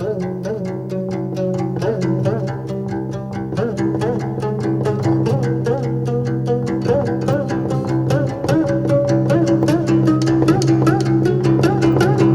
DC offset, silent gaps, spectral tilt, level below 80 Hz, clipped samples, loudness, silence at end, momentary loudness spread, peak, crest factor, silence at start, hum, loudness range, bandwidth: under 0.1%; none; -8 dB/octave; -44 dBFS; under 0.1%; -18 LUFS; 0 s; 9 LU; -2 dBFS; 14 dB; 0 s; none; 6 LU; 12 kHz